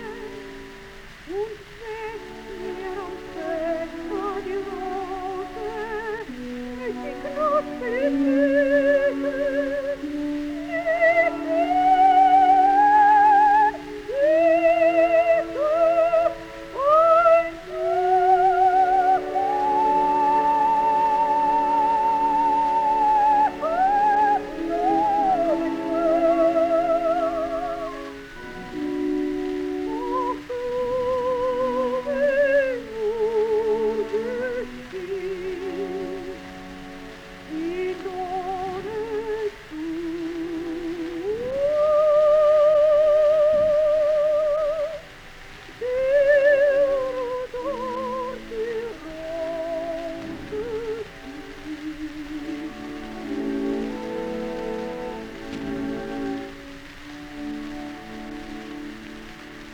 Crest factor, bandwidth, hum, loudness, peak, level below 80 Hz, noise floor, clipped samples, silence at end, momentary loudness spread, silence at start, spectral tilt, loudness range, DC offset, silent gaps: 16 dB; 15 kHz; none; -22 LUFS; -6 dBFS; -48 dBFS; -42 dBFS; under 0.1%; 0 s; 18 LU; 0 s; -5.5 dB/octave; 13 LU; under 0.1%; none